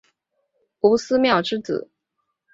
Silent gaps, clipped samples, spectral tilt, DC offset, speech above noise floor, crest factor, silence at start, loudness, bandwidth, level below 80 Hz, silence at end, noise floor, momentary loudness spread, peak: none; under 0.1%; -5 dB/octave; under 0.1%; 58 dB; 20 dB; 0.85 s; -20 LUFS; 7.8 kHz; -60 dBFS; 0.7 s; -77 dBFS; 10 LU; -4 dBFS